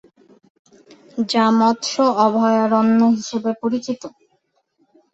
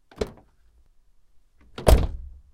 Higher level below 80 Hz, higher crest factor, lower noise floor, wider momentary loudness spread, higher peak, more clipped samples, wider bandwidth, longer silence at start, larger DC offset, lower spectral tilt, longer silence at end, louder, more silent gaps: second, -66 dBFS vs -28 dBFS; second, 16 dB vs 26 dB; first, -66 dBFS vs -57 dBFS; second, 13 LU vs 22 LU; about the same, -2 dBFS vs 0 dBFS; neither; second, 8 kHz vs 16.5 kHz; first, 1.15 s vs 0.2 s; neither; about the same, -5 dB/octave vs -6 dB/octave; first, 1.05 s vs 0.3 s; first, -17 LUFS vs -24 LUFS; neither